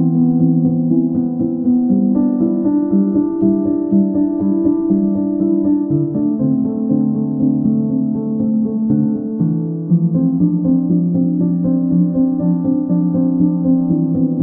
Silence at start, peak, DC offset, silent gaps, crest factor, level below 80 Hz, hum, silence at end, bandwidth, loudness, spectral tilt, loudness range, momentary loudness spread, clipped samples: 0 s; -2 dBFS; under 0.1%; none; 12 dB; -50 dBFS; none; 0 s; 1.8 kHz; -16 LUFS; -16.5 dB/octave; 1 LU; 3 LU; under 0.1%